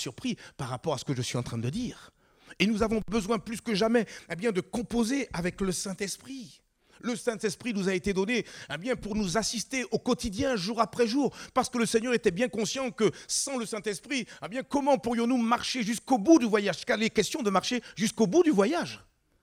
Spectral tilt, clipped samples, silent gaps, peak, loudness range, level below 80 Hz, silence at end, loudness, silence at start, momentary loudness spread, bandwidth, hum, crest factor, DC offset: -4.5 dB/octave; under 0.1%; none; -8 dBFS; 6 LU; -54 dBFS; 0.45 s; -29 LUFS; 0 s; 9 LU; 16 kHz; none; 20 dB; under 0.1%